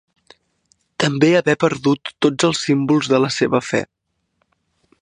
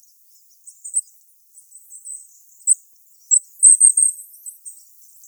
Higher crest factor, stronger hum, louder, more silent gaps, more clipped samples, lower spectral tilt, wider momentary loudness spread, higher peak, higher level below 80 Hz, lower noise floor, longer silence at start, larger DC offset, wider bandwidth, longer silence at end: about the same, 18 dB vs 20 dB; neither; second, -17 LUFS vs -13 LUFS; neither; neither; first, -5 dB/octave vs 10.5 dB/octave; second, 8 LU vs 26 LU; about the same, -2 dBFS vs 0 dBFS; first, -60 dBFS vs under -90 dBFS; first, -69 dBFS vs -52 dBFS; first, 1 s vs 0.85 s; neither; second, 10.5 kHz vs over 20 kHz; first, 1.2 s vs 0.6 s